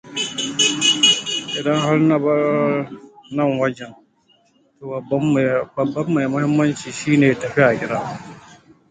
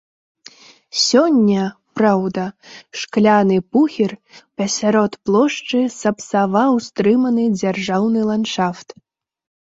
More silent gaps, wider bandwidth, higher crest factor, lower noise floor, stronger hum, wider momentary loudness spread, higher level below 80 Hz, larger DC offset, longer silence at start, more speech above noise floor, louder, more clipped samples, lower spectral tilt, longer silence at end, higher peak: neither; first, 9.4 kHz vs 8 kHz; about the same, 18 dB vs 16 dB; first, -59 dBFS vs -45 dBFS; neither; first, 15 LU vs 11 LU; about the same, -58 dBFS vs -60 dBFS; neither; second, 0.05 s vs 0.95 s; first, 40 dB vs 28 dB; about the same, -18 LUFS vs -17 LUFS; neither; about the same, -4 dB/octave vs -5 dB/octave; second, 0.35 s vs 0.9 s; about the same, 0 dBFS vs -2 dBFS